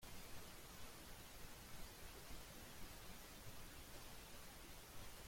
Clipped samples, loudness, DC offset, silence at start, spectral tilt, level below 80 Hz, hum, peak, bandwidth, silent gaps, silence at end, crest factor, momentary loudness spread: under 0.1%; -57 LUFS; under 0.1%; 0 s; -3 dB/octave; -62 dBFS; none; -42 dBFS; 16.5 kHz; none; 0 s; 14 dB; 1 LU